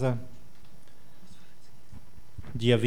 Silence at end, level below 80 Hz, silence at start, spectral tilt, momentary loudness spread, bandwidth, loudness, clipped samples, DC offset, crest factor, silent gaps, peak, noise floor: 0 s; -56 dBFS; 0 s; -7 dB/octave; 27 LU; 16 kHz; -30 LUFS; under 0.1%; 2%; 22 dB; none; -10 dBFS; -58 dBFS